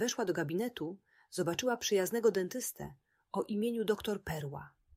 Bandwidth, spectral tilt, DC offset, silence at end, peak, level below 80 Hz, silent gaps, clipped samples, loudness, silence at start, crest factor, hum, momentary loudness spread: 16 kHz; -4 dB/octave; under 0.1%; 0.3 s; -18 dBFS; -66 dBFS; none; under 0.1%; -35 LUFS; 0 s; 18 dB; none; 13 LU